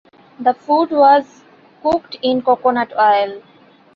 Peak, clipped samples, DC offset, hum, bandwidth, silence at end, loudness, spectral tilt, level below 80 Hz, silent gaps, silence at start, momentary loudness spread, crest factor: -2 dBFS; under 0.1%; under 0.1%; none; 7 kHz; 0.55 s; -16 LUFS; -5.5 dB/octave; -58 dBFS; none; 0.4 s; 8 LU; 16 dB